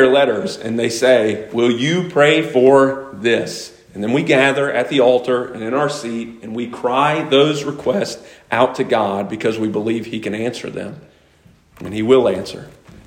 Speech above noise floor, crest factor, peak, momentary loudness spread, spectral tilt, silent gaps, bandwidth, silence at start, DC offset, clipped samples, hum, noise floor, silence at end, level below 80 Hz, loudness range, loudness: 34 dB; 16 dB; 0 dBFS; 14 LU; -5 dB/octave; none; 16 kHz; 0 s; under 0.1%; under 0.1%; none; -51 dBFS; 0.35 s; -56 dBFS; 6 LU; -17 LUFS